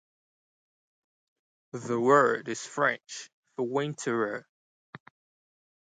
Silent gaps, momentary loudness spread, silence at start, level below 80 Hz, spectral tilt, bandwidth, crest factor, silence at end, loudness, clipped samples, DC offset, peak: 3.33-3.43 s, 4.49-4.93 s; 20 LU; 1.75 s; -82 dBFS; -4.5 dB/octave; 9.4 kHz; 22 dB; 0.95 s; -28 LUFS; under 0.1%; under 0.1%; -10 dBFS